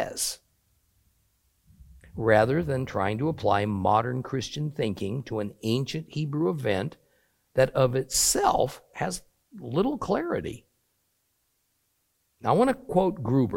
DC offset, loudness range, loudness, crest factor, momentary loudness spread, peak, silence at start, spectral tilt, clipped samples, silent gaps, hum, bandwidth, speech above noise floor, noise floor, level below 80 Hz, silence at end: under 0.1%; 5 LU; -26 LUFS; 22 dB; 10 LU; -6 dBFS; 0 s; -4.5 dB/octave; under 0.1%; none; none; 16.5 kHz; 48 dB; -73 dBFS; -52 dBFS; 0 s